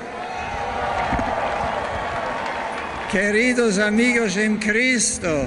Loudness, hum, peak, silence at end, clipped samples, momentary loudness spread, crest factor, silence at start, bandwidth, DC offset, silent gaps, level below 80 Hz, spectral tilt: -21 LUFS; none; -6 dBFS; 0 s; under 0.1%; 9 LU; 14 dB; 0 s; 11.5 kHz; under 0.1%; none; -42 dBFS; -3.5 dB/octave